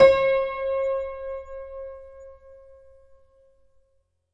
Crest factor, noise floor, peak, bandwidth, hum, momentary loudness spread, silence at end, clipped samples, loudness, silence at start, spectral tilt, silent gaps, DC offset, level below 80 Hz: 22 dB; -68 dBFS; -4 dBFS; 7.4 kHz; none; 24 LU; 1.8 s; under 0.1%; -25 LUFS; 0 s; -5 dB/octave; none; under 0.1%; -52 dBFS